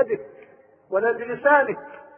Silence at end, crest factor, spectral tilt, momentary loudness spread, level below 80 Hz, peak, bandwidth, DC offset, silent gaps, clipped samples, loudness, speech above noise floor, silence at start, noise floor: 0.2 s; 20 dB; -9.5 dB/octave; 12 LU; -70 dBFS; -4 dBFS; 3.5 kHz; under 0.1%; none; under 0.1%; -22 LUFS; 29 dB; 0 s; -51 dBFS